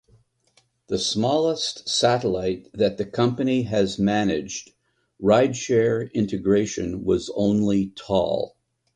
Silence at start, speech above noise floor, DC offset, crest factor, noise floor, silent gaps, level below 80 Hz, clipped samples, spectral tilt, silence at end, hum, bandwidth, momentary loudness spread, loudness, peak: 0.9 s; 42 dB; under 0.1%; 18 dB; -64 dBFS; none; -52 dBFS; under 0.1%; -5 dB/octave; 0.45 s; none; 10.5 kHz; 7 LU; -23 LUFS; -4 dBFS